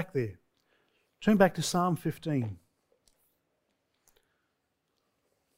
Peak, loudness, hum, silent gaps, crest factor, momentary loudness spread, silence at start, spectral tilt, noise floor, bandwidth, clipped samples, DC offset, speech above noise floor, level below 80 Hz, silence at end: -8 dBFS; -29 LUFS; none; none; 24 dB; 15 LU; 0 s; -5.5 dB/octave; -80 dBFS; 16 kHz; under 0.1%; under 0.1%; 52 dB; -62 dBFS; 3 s